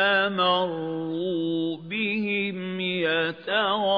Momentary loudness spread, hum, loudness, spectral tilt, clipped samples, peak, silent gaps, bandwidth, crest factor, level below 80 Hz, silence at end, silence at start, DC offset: 7 LU; none; -25 LUFS; -7.5 dB/octave; under 0.1%; -8 dBFS; none; 5.4 kHz; 16 dB; -74 dBFS; 0 s; 0 s; under 0.1%